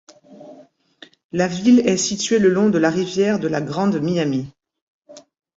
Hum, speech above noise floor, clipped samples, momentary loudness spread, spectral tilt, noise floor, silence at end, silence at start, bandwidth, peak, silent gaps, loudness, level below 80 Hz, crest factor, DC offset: none; 31 dB; under 0.1%; 8 LU; -5 dB/octave; -49 dBFS; 0.35 s; 0.3 s; 8 kHz; -4 dBFS; 1.24-1.29 s, 4.82-5.02 s; -18 LUFS; -58 dBFS; 16 dB; under 0.1%